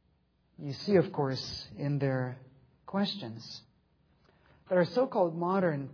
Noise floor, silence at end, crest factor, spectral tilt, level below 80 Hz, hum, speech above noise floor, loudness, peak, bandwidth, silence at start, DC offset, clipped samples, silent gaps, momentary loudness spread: -71 dBFS; 0 s; 20 dB; -7 dB/octave; -68 dBFS; none; 40 dB; -31 LUFS; -12 dBFS; 5.4 kHz; 0.6 s; under 0.1%; under 0.1%; none; 16 LU